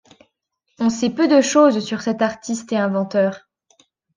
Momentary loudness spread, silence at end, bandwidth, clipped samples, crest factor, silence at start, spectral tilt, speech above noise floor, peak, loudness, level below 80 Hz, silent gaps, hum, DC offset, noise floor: 9 LU; 0.8 s; 10 kHz; under 0.1%; 16 dB; 0.8 s; -5 dB/octave; 54 dB; -2 dBFS; -18 LUFS; -66 dBFS; none; none; under 0.1%; -72 dBFS